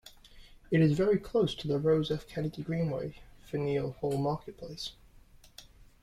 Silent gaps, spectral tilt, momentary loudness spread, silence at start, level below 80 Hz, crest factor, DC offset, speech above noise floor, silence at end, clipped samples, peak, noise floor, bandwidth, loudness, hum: none; -7.5 dB/octave; 14 LU; 0.05 s; -56 dBFS; 18 dB; under 0.1%; 27 dB; 0.4 s; under 0.1%; -14 dBFS; -57 dBFS; 14 kHz; -31 LUFS; none